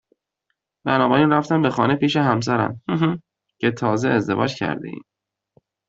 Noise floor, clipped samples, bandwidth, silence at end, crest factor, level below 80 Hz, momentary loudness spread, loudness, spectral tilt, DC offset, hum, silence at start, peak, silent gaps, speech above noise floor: -77 dBFS; under 0.1%; 7.8 kHz; 0.85 s; 18 dB; -58 dBFS; 12 LU; -20 LUFS; -6.5 dB/octave; under 0.1%; none; 0.85 s; -2 dBFS; none; 57 dB